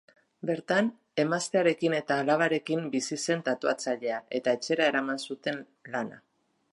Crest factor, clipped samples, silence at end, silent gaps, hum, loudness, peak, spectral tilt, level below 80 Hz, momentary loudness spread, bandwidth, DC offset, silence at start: 18 dB; under 0.1%; 0.55 s; none; none; -29 LUFS; -10 dBFS; -4.5 dB/octave; -82 dBFS; 9 LU; 11.5 kHz; under 0.1%; 0.45 s